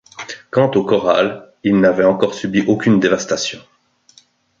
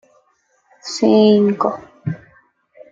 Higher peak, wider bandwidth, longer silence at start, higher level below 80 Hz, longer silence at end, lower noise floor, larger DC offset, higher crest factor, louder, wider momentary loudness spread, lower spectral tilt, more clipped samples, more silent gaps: about the same, 0 dBFS vs -2 dBFS; about the same, 7.8 kHz vs 7.8 kHz; second, 0.2 s vs 0.85 s; first, -54 dBFS vs -62 dBFS; first, 1 s vs 0.75 s; second, -52 dBFS vs -62 dBFS; neither; about the same, 16 dB vs 16 dB; about the same, -16 LUFS vs -16 LUFS; second, 10 LU vs 18 LU; about the same, -5.5 dB/octave vs -6.5 dB/octave; neither; neither